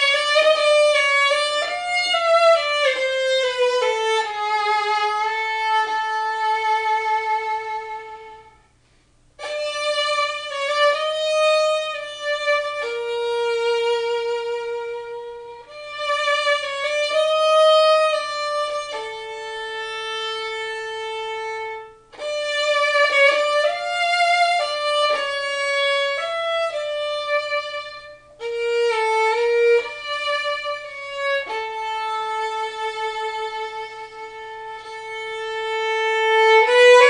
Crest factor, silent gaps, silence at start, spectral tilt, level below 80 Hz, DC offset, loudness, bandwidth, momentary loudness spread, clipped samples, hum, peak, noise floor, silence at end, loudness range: 20 dB; none; 0 s; 1 dB/octave; -62 dBFS; under 0.1%; -20 LUFS; 10.5 kHz; 15 LU; under 0.1%; none; -2 dBFS; -57 dBFS; 0 s; 8 LU